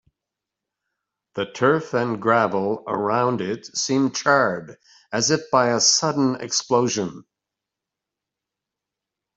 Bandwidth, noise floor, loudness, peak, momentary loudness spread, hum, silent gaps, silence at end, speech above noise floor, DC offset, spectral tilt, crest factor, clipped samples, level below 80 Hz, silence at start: 8.2 kHz; -86 dBFS; -21 LUFS; -4 dBFS; 11 LU; none; none; 2.15 s; 65 dB; under 0.1%; -3.5 dB/octave; 20 dB; under 0.1%; -66 dBFS; 1.35 s